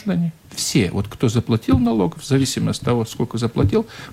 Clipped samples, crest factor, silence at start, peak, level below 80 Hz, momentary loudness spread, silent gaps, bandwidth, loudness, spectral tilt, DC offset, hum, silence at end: under 0.1%; 14 dB; 0 s; -4 dBFS; -40 dBFS; 6 LU; none; 16 kHz; -20 LUFS; -6 dB/octave; under 0.1%; none; 0 s